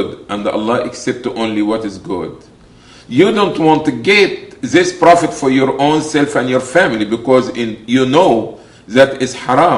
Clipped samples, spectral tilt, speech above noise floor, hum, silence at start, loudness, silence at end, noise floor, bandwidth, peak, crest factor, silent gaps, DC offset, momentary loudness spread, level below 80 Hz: 0.2%; -5 dB/octave; 28 dB; none; 0 s; -13 LUFS; 0 s; -41 dBFS; 11.5 kHz; 0 dBFS; 14 dB; none; under 0.1%; 11 LU; -50 dBFS